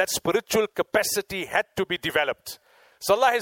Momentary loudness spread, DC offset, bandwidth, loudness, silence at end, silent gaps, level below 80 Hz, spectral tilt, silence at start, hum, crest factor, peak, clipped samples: 11 LU; under 0.1%; 17 kHz; -25 LUFS; 0 s; none; -58 dBFS; -2.5 dB/octave; 0 s; none; 18 dB; -8 dBFS; under 0.1%